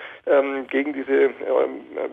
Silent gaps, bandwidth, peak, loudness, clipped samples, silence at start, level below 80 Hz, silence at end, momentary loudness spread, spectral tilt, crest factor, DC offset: none; 3.9 kHz; -6 dBFS; -22 LUFS; under 0.1%; 0 s; -72 dBFS; 0 s; 5 LU; -6.5 dB/octave; 14 dB; under 0.1%